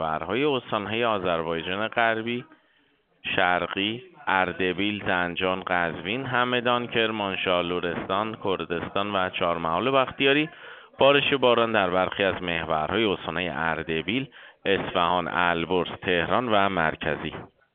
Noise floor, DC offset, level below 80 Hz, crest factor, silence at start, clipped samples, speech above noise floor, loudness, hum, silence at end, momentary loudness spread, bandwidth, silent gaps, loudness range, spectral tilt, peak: -65 dBFS; under 0.1%; -56 dBFS; 22 dB; 0 s; under 0.1%; 40 dB; -25 LUFS; none; 0.3 s; 7 LU; 4.6 kHz; none; 4 LU; -2.5 dB/octave; -4 dBFS